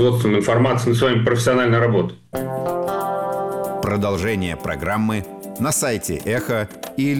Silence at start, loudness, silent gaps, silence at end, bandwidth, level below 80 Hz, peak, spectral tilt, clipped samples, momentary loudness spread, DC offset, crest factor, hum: 0 s; -20 LUFS; none; 0 s; 18 kHz; -46 dBFS; -8 dBFS; -5.5 dB/octave; under 0.1%; 8 LU; 0.2%; 12 dB; none